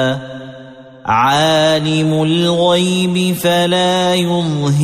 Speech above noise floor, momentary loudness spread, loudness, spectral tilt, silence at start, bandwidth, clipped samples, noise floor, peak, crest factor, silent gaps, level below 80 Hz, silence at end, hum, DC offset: 22 dB; 11 LU; -13 LUFS; -5 dB/octave; 0 s; 15 kHz; under 0.1%; -36 dBFS; -2 dBFS; 12 dB; none; -52 dBFS; 0 s; none; under 0.1%